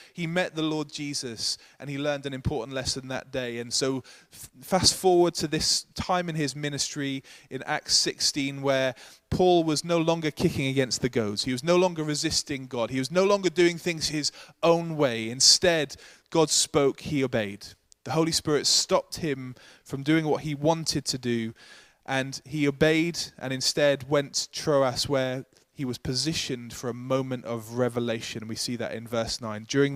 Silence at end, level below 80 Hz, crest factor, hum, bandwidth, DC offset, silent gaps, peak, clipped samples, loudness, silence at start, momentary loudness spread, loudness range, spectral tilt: 0 s; -54 dBFS; 22 dB; none; 15.5 kHz; under 0.1%; none; -6 dBFS; under 0.1%; -26 LUFS; 0 s; 12 LU; 7 LU; -3.5 dB/octave